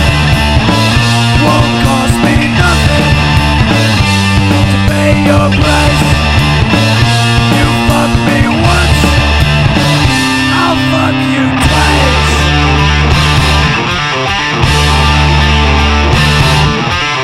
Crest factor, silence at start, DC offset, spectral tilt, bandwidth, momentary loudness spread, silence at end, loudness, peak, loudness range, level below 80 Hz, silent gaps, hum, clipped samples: 8 dB; 0 s; under 0.1%; -5 dB/octave; 15.5 kHz; 2 LU; 0 s; -8 LUFS; 0 dBFS; 0 LU; -16 dBFS; none; none; under 0.1%